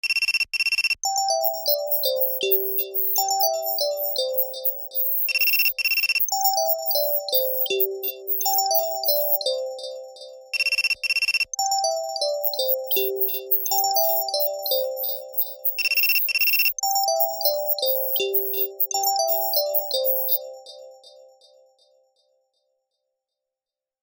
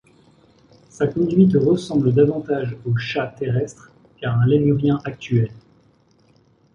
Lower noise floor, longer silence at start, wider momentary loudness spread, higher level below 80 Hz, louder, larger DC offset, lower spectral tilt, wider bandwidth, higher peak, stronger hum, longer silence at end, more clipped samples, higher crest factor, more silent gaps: first, -90 dBFS vs -57 dBFS; second, 0.05 s vs 1 s; second, 6 LU vs 9 LU; second, -72 dBFS vs -52 dBFS; about the same, -21 LUFS vs -20 LUFS; neither; second, 2 dB/octave vs -8.5 dB/octave; first, 19 kHz vs 10 kHz; about the same, -4 dBFS vs -4 dBFS; neither; first, 2.95 s vs 1.15 s; neither; about the same, 20 dB vs 18 dB; neither